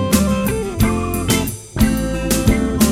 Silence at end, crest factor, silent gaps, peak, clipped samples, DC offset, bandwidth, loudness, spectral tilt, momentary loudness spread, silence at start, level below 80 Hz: 0 s; 16 dB; none; -2 dBFS; under 0.1%; under 0.1%; 17 kHz; -18 LUFS; -5 dB/octave; 5 LU; 0 s; -26 dBFS